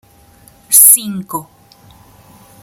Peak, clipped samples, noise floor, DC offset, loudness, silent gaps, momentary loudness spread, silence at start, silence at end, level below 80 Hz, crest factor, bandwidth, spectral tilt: 0 dBFS; 0.8%; -45 dBFS; under 0.1%; -6 LUFS; none; 21 LU; 0.7 s; 1.2 s; -56 dBFS; 16 dB; over 20 kHz; -1.5 dB/octave